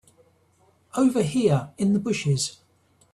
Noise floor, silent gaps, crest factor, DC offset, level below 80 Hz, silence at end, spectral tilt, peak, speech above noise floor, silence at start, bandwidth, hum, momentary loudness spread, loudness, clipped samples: -62 dBFS; none; 16 dB; under 0.1%; -60 dBFS; 0.65 s; -6 dB/octave; -8 dBFS; 40 dB; 0.95 s; 12.5 kHz; none; 5 LU; -24 LUFS; under 0.1%